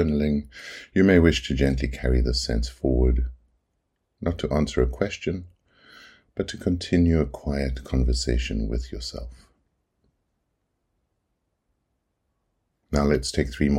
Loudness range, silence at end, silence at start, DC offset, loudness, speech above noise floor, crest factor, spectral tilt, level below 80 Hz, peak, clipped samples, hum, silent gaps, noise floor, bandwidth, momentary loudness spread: 10 LU; 0 s; 0 s; under 0.1%; -24 LUFS; 53 dB; 22 dB; -6 dB/octave; -30 dBFS; -2 dBFS; under 0.1%; none; none; -76 dBFS; 11.5 kHz; 13 LU